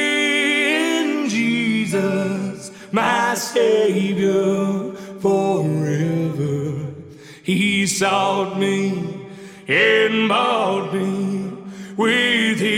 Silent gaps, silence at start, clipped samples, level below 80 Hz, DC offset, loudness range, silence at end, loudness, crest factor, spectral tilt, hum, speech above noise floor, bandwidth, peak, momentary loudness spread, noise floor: none; 0 s; under 0.1%; -62 dBFS; under 0.1%; 3 LU; 0 s; -19 LUFS; 14 dB; -4.5 dB/octave; none; 21 dB; 16.5 kHz; -6 dBFS; 13 LU; -39 dBFS